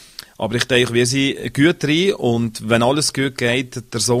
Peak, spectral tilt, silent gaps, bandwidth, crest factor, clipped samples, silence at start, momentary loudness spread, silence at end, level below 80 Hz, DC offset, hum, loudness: 0 dBFS; -4 dB/octave; none; 15.5 kHz; 18 dB; under 0.1%; 0.2 s; 7 LU; 0 s; -50 dBFS; under 0.1%; none; -18 LUFS